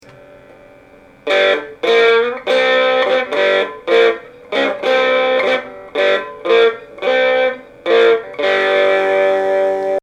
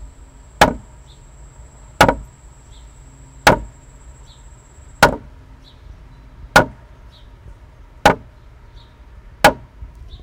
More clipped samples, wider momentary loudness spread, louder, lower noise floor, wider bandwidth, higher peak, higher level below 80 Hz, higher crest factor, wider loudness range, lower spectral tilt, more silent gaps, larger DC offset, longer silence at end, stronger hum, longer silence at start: neither; second, 6 LU vs 20 LU; about the same, -14 LUFS vs -16 LUFS; about the same, -44 dBFS vs -42 dBFS; second, 9.2 kHz vs 16 kHz; about the same, -2 dBFS vs 0 dBFS; second, -58 dBFS vs -36 dBFS; second, 14 dB vs 22 dB; about the same, 1 LU vs 1 LU; about the same, -3 dB/octave vs -4 dB/octave; neither; neither; second, 0.05 s vs 0.35 s; neither; first, 1.25 s vs 0 s